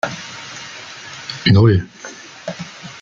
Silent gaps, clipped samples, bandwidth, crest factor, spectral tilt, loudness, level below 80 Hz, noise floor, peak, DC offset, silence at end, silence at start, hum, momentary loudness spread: none; under 0.1%; 7.6 kHz; 18 dB; -6 dB/octave; -16 LUFS; -50 dBFS; -36 dBFS; -2 dBFS; under 0.1%; 0.1 s; 0.05 s; none; 20 LU